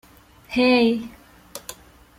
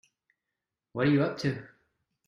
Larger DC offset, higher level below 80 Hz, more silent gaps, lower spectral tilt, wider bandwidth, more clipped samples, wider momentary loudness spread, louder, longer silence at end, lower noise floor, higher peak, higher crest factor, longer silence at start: neither; first, -54 dBFS vs -66 dBFS; neither; second, -4 dB/octave vs -7.5 dB/octave; first, 16 kHz vs 9.6 kHz; neither; first, 23 LU vs 16 LU; first, -20 LUFS vs -28 LUFS; second, 0.45 s vs 0.6 s; second, -48 dBFS vs -88 dBFS; first, -6 dBFS vs -14 dBFS; about the same, 18 dB vs 18 dB; second, 0.5 s vs 0.95 s